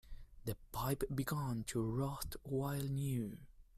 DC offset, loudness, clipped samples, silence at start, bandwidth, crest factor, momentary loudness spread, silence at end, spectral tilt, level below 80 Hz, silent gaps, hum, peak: under 0.1%; -41 LUFS; under 0.1%; 0.05 s; 16 kHz; 16 dB; 8 LU; 0 s; -6 dB/octave; -54 dBFS; none; none; -24 dBFS